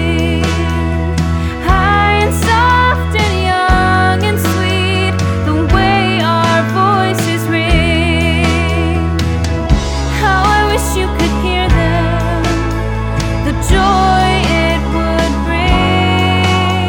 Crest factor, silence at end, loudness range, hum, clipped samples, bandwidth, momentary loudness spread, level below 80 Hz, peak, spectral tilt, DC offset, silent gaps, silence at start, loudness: 12 dB; 0 s; 2 LU; none; under 0.1%; 19 kHz; 5 LU; -20 dBFS; 0 dBFS; -5.5 dB/octave; under 0.1%; none; 0 s; -13 LUFS